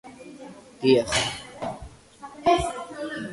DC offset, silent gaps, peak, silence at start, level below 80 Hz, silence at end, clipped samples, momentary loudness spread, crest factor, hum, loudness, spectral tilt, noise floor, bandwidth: under 0.1%; none; -6 dBFS; 0.05 s; -48 dBFS; 0 s; under 0.1%; 23 LU; 20 dB; none; -25 LUFS; -4 dB/octave; -45 dBFS; 11.5 kHz